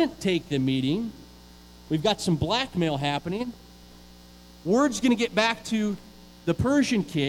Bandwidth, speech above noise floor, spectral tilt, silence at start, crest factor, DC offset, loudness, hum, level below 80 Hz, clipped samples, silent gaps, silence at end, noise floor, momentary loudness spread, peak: 16.5 kHz; 24 dB; -5 dB/octave; 0 s; 18 dB; under 0.1%; -26 LUFS; 60 Hz at -50 dBFS; -52 dBFS; under 0.1%; none; 0 s; -49 dBFS; 10 LU; -8 dBFS